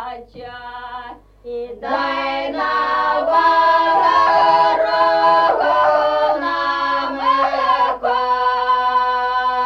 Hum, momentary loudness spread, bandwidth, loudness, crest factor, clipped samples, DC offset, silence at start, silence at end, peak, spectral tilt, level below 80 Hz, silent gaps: none; 18 LU; 6.8 kHz; -16 LUFS; 12 dB; under 0.1%; under 0.1%; 0 s; 0 s; -4 dBFS; -4 dB/octave; -50 dBFS; none